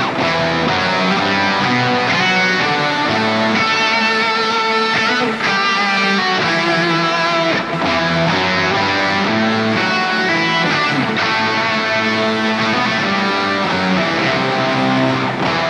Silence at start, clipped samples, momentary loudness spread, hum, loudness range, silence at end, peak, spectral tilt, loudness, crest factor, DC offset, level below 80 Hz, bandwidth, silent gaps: 0 s; under 0.1%; 2 LU; none; 1 LU; 0 s; -4 dBFS; -4.5 dB/octave; -15 LUFS; 12 dB; under 0.1%; -52 dBFS; 11.5 kHz; none